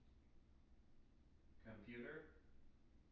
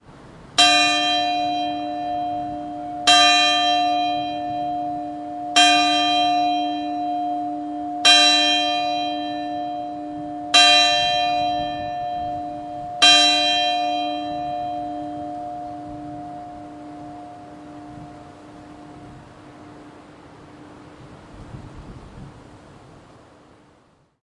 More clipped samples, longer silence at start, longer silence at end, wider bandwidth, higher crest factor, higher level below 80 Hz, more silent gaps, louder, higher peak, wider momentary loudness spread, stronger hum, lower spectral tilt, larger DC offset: neither; about the same, 0 s vs 0.1 s; second, 0 s vs 1.4 s; second, 5.6 kHz vs 11.5 kHz; about the same, 18 dB vs 22 dB; second, -72 dBFS vs -54 dBFS; neither; second, -58 LUFS vs -18 LUFS; second, -42 dBFS vs 0 dBFS; second, 12 LU vs 25 LU; neither; first, -5 dB/octave vs -1.5 dB/octave; neither